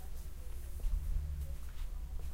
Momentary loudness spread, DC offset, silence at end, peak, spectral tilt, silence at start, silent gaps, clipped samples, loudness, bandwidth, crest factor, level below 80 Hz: 8 LU; under 0.1%; 0 s; -24 dBFS; -5.5 dB/octave; 0 s; none; under 0.1%; -44 LUFS; 16 kHz; 14 dB; -38 dBFS